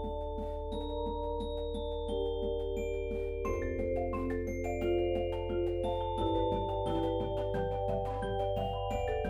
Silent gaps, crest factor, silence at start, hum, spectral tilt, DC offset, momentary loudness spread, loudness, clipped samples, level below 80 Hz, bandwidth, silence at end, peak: none; 14 dB; 0 s; none; -7.5 dB/octave; under 0.1%; 5 LU; -35 LUFS; under 0.1%; -42 dBFS; 14.5 kHz; 0 s; -20 dBFS